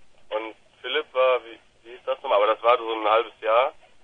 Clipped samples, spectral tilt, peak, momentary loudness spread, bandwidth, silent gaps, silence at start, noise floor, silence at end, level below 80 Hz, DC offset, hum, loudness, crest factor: under 0.1%; -4 dB/octave; -4 dBFS; 12 LU; 5 kHz; none; 0 s; -47 dBFS; 0.3 s; -70 dBFS; under 0.1%; none; -23 LUFS; 22 dB